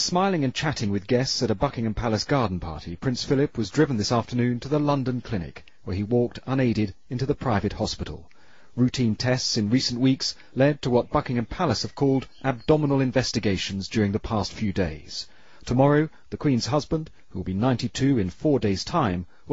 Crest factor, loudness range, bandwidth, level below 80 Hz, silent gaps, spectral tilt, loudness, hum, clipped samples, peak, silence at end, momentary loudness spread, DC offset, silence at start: 18 dB; 3 LU; 8 kHz; -46 dBFS; none; -5.5 dB/octave; -25 LUFS; none; under 0.1%; -6 dBFS; 0 s; 9 LU; 0.5%; 0 s